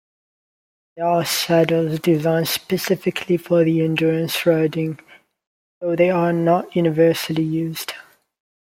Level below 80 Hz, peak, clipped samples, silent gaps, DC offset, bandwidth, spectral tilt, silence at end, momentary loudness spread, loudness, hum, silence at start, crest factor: -62 dBFS; -4 dBFS; under 0.1%; 5.47-5.81 s; under 0.1%; 16.5 kHz; -5.5 dB/octave; 0.65 s; 9 LU; -19 LUFS; none; 0.95 s; 16 dB